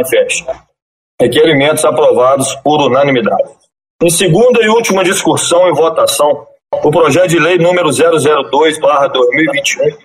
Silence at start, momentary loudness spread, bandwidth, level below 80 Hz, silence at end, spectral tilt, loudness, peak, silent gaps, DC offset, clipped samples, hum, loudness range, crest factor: 0 s; 6 LU; 16 kHz; -50 dBFS; 0.1 s; -4 dB/octave; -10 LUFS; 0 dBFS; 0.82-1.18 s, 3.90-3.99 s; under 0.1%; under 0.1%; none; 1 LU; 10 dB